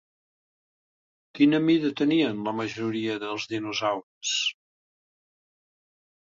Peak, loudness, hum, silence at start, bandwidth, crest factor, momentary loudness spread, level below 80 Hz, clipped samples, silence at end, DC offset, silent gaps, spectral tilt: -8 dBFS; -26 LUFS; none; 1.35 s; 7.6 kHz; 20 dB; 9 LU; -70 dBFS; under 0.1%; 1.8 s; under 0.1%; 4.03-4.21 s; -4 dB/octave